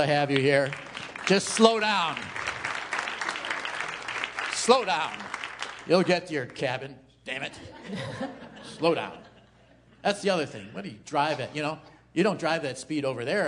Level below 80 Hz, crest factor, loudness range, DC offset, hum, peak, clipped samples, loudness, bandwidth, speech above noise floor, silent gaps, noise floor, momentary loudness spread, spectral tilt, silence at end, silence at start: -66 dBFS; 26 dB; 6 LU; under 0.1%; none; -2 dBFS; under 0.1%; -27 LUFS; 11 kHz; 31 dB; none; -57 dBFS; 15 LU; -4 dB/octave; 0 s; 0 s